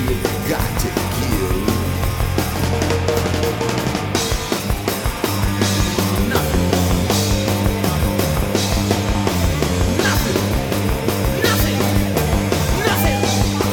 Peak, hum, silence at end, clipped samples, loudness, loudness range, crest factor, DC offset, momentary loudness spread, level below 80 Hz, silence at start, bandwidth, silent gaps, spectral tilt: 0 dBFS; none; 0 s; under 0.1%; -18 LUFS; 2 LU; 16 dB; under 0.1%; 4 LU; -26 dBFS; 0 s; 19.5 kHz; none; -5 dB/octave